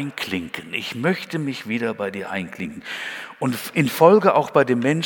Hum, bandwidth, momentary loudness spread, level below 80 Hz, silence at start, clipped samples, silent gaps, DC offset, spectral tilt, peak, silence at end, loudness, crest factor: none; 19 kHz; 15 LU; -64 dBFS; 0 s; under 0.1%; none; under 0.1%; -5.5 dB/octave; 0 dBFS; 0 s; -21 LUFS; 22 dB